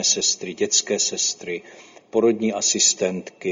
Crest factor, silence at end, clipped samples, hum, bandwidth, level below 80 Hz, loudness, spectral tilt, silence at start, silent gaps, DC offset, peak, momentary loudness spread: 18 dB; 0 s; under 0.1%; none; 7.8 kHz; -68 dBFS; -20 LUFS; -1.5 dB/octave; 0 s; none; under 0.1%; -4 dBFS; 12 LU